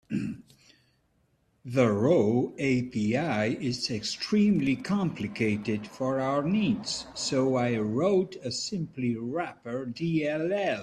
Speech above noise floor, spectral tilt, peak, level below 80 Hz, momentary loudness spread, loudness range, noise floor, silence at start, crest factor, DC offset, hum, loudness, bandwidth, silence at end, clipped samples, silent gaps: 42 dB; -5.5 dB/octave; -10 dBFS; -62 dBFS; 9 LU; 3 LU; -70 dBFS; 0.1 s; 18 dB; under 0.1%; none; -28 LUFS; 10.5 kHz; 0 s; under 0.1%; none